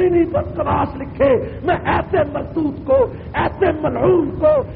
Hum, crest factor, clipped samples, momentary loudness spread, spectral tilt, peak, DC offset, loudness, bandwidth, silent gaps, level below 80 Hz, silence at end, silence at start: none; 14 dB; under 0.1%; 6 LU; -6.5 dB/octave; -4 dBFS; under 0.1%; -18 LUFS; 4.7 kHz; none; -36 dBFS; 0 s; 0 s